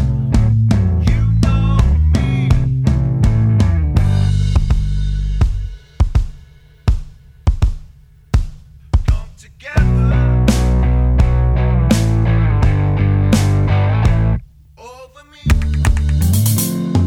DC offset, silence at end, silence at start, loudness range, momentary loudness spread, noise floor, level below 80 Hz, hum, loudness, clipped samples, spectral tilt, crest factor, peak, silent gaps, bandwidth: under 0.1%; 0 s; 0 s; 7 LU; 7 LU; -42 dBFS; -18 dBFS; none; -16 LUFS; under 0.1%; -7 dB/octave; 14 dB; 0 dBFS; none; 19 kHz